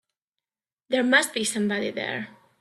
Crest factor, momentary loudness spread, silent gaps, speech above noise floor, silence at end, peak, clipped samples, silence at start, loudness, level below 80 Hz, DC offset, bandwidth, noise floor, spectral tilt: 20 dB; 12 LU; none; over 65 dB; 0.3 s; -6 dBFS; under 0.1%; 0.9 s; -24 LUFS; -72 dBFS; under 0.1%; 14 kHz; under -90 dBFS; -3 dB/octave